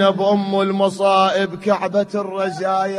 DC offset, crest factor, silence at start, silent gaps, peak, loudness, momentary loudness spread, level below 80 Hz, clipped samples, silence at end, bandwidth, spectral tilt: under 0.1%; 16 dB; 0 s; none; -2 dBFS; -18 LUFS; 7 LU; -64 dBFS; under 0.1%; 0 s; 11.5 kHz; -5.5 dB/octave